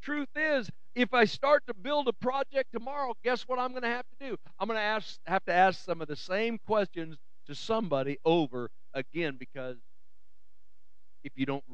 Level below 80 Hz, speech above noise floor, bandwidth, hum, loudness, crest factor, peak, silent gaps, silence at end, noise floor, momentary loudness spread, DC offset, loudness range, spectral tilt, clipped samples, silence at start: -72 dBFS; 46 dB; 8.8 kHz; none; -31 LUFS; 22 dB; -10 dBFS; none; 0 s; -77 dBFS; 16 LU; 1%; 5 LU; -5.5 dB/octave; under 0.1%; 0 s